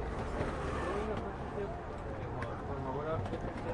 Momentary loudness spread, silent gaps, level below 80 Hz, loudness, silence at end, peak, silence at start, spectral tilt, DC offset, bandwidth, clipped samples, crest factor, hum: 5 LU; none; -46 dBFS; -39 LUFS; 0 s; -22 dBFS; 0 s; -7 dB/octave; under 0.1%; 11.5 kHz; under 0.1%; 16 dB; none